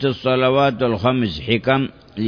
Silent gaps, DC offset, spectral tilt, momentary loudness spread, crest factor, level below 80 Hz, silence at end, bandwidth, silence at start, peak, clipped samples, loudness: none; under 0.1%; -8 dB/octave; 5 LU; 16 dB; -46 dBFS; 0 s; 5.4 kHz; 0 s; -2 dBFS; under 0.1%; -18 LUFS